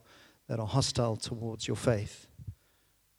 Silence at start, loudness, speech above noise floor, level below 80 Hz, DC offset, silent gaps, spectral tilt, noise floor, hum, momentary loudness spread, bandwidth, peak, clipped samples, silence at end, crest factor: 0.5 s; -33 LUFS; 37 dB; -58 dBFS; under 0.1%; none; -5 dB/octave; -69 dBFS; none; 19 LU; 15.5 kHz; -12 dBFS; under 0.1%; 0.65 s; 22 dB